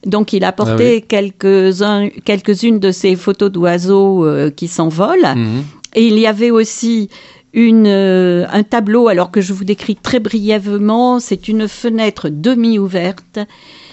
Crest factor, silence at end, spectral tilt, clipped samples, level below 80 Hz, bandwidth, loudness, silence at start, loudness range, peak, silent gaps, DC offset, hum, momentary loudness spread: 12 dB; 0.5 s; -6 dB/octave; under 0.1%; -52 dBFS; 8.4 kHz; -12 LUFS; 0.05 s; 3 LU; 0 dBFS; none; under 0.1%; none; 7 LU